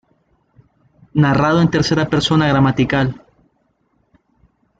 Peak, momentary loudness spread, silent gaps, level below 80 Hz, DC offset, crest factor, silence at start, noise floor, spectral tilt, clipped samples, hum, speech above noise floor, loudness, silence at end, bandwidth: -2 dBFS; 8 LU; none; -42 dBFS; under 0.1%; 16 dB; 1.15 s; -63 dBFS; -6.5 dB/octave; under 0.1%; none; 49 dB; -15 LUFS; 1.65 s; 8 kHz